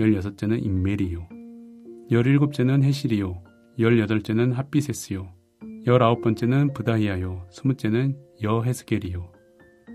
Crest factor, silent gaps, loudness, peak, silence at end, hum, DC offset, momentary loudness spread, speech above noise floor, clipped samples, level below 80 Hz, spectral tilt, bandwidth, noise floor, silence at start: 20 dB; none; -23 LUFS; -4 dBFS; 0 s; none; under 0.1%; 20 LU; 32 dB; under 0.1%; -44 dBFS; -7.5 dB/octave; 14 kHz; -54 dBFS; 0 s